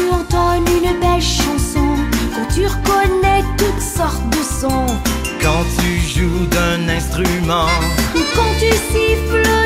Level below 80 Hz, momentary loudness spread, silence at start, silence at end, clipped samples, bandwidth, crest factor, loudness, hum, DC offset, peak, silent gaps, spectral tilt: -22 dBFS; 4 LU; 0 s; 0 s; under 0.1%; 16 kHz; 14 dB; -16 LUFS; none; under 0.1%; 0 dBFS; none; -4.5 dB/octave